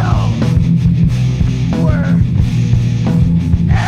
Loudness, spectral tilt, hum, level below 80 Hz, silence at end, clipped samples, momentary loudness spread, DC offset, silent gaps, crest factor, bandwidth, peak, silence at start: -13 LUFS; -8 dB/octave; none; -22 dBFS; 0 s; under 0.1%; 2 LU; under 0.1%; none; 12 dB; 8.6 kHz; 0 dBFS; 0 s